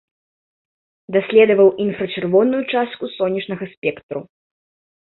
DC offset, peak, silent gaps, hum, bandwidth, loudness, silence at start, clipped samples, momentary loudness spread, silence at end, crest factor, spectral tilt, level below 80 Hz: under 0.1%; -2 dBFS; 3.77-3.82 s, 4.03-4.09 s; none; 4.2 kHz; -18 LUFS; 1.1 s; under 0.1%; 14 LU; 0.8 s; 18 dB; -11 dB/octave; -62 dBFS